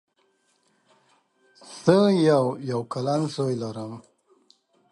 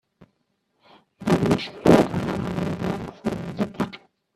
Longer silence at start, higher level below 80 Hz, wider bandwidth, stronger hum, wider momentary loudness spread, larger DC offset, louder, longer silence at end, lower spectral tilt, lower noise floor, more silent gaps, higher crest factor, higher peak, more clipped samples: first, 1.65 s vs 0.2 s; second, -68 dBFS vs -50 dBFS; second, 11.5 kHz vs 14 kHz; neither; first, 19 LU vs 13 LU; neither; about the same, -23 LUFS vs -23 LUFS; first, 0.9 s vs 0.4 s; about the same, -7 dB/octave vs -7 dB/octave; second, -68 dBFS vs -72 dBFS; neither; about the same, 22 dB vs 22 dB; about the same, -4 dBFS vs -2 dBFS; neither